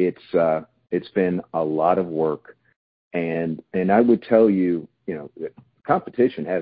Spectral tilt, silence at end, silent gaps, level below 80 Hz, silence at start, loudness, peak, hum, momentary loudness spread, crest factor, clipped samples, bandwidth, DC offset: -12 dB/octave; 0 s; 2.76-3.11 s; -60 dBFS; 0 s; -22 LUFS; -4 dBFS; none; 15 LU; 18 dB; under 0.1%; 5 kHz; under 0.1%